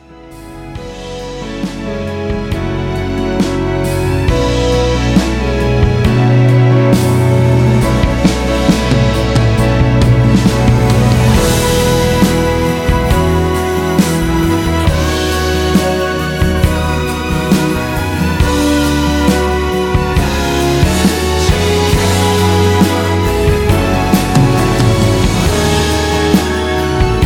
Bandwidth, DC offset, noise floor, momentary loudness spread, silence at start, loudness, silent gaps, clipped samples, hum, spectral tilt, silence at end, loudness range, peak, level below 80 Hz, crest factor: 17 kHz; under 0.1%; -33 dBFS; 7 LU; 0.1 s; -12 LUFS; none; under 0.1%; none; -6 dB/octave; 0 s; 4 LU; 0 dBFS; -20 dBFS; 12 dB